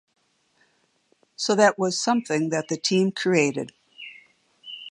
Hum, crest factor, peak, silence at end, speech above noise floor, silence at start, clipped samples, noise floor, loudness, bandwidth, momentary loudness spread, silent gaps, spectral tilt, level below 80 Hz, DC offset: none; 22 dB; -4 dBFS; 0.05 s; 44 dB; 1.4 s; under 0.1%; -66 dBFS; -23 LUFS; 11.5 kHz; 21 LU; none; -4 dB/octave; -76 dBFS; under 0.1%